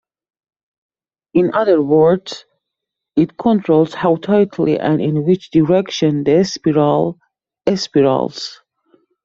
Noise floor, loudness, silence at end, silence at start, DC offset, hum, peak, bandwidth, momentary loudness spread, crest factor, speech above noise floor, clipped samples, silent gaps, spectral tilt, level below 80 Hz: -80 dBFS; -15 LUFS; 0.7 s; 1.35 s; under 0.1%; none; 0 dBFS; 7.6 kHz; 8 LU; 16 dB; 66 dB; under 0.1%; none; -7 dB/octave; -54 dBFS